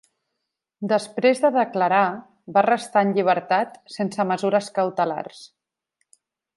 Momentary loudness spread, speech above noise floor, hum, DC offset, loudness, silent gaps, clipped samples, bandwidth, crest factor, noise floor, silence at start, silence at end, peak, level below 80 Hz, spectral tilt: 10 LU; 60 dB; none; under 0.1%; -22 LUFS; none; under 0.1%; 11.5 kHz; 18 dB; -81 dBFS; 0.8 s; 1.1 s; -4 dBFS; -76 dBFS; -5.5 dB/octave